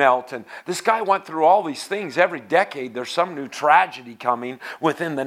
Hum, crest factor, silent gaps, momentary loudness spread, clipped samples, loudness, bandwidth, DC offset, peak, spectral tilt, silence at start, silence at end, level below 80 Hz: none; 20 dB; none; 11 LU; under 0.1%; -21 LUFS; 15.5 kHz; under 0.1%; 0 dBFS; -4 dB/octave; 0 s; 0 s; -78 dBFS